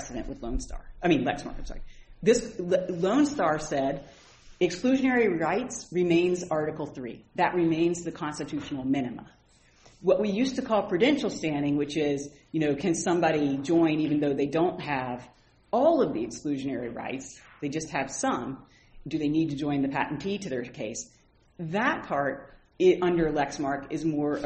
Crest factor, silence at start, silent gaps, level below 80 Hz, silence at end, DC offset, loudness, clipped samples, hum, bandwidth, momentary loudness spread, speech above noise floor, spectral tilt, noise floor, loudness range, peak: 18 dB; 0 s; none; -48 dBFS; 0 s; under 0.1%; -27 LUFS; under 0.1%; none; 8.4 kHz; 13 LU; 32 dB; -5.5 dB/octave; -59 dBFS; 4 LU; -10 dBFS